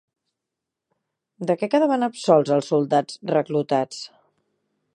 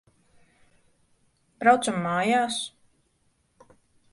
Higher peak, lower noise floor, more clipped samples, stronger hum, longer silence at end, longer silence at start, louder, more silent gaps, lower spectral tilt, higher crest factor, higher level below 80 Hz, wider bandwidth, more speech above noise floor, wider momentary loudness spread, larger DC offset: about the same, -4 dBFS vs -6 dBFS; first, -84 dBFS vs -69 dBFS; neither; neither; second, 0.85 s vs 1.45 s; second, 1.4 s vs 1.6 s; first, -21 LUFS vs -24 LUFS; neither; first, -6 dB/octave vs -4 dB/octave; about the same, 20 dB vs 24 dB; second, -76 dBFS vs -70 dBFS; about the same, 11.5 kHz vs 11.5 kHz; first, 64 dB vs 46 dB; first, 13 LU vs 10 LU; neither